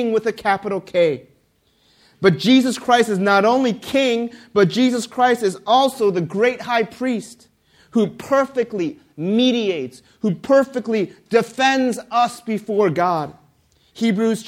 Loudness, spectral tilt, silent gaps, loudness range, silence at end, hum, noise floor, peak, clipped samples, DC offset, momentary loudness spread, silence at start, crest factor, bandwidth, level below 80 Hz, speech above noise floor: -19 LUFS; -5 dB/octave; none; 4 LU; 0 s; none; -61 dBFS; 0 dBFS; under 0.1%; under 0.1%; 9 LU; 0 s; 18 dB; 15.5 kHz; -62 dBFS; 43 dB